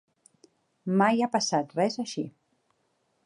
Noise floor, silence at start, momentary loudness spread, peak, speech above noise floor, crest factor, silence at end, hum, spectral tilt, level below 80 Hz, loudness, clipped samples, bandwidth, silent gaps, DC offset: -73 dBFS; 0.85 s; 14 LU; -10 dBFS; 47 dB; 20 dB; 0.95 s; none; -4.5 dB/octave; -80 dBFS; -27 LUFS; under 0.1%; 11 kHz; none; under 0.1%